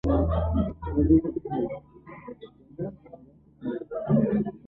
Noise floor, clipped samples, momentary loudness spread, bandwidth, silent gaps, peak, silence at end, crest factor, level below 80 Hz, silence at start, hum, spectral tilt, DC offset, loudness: -51 dBFS; under 0.1%; 22 LU; 4 kHz; none; -10 dBFS; 0.1 s; 18 dB; -36 dBFS; 0.05 s; none; -11.5 dB/octave; under 0.1%; -27 LUFS